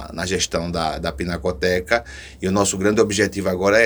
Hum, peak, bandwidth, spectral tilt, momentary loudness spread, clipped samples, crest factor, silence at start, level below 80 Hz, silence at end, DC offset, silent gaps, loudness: none; -2 dBFS; over 20 kHz; -4 dB/octave; 7 LU; under 0.1%; 18 dB; 0 s; -40 dBFS; 0 s; under 0.1%; none; -21 LUFS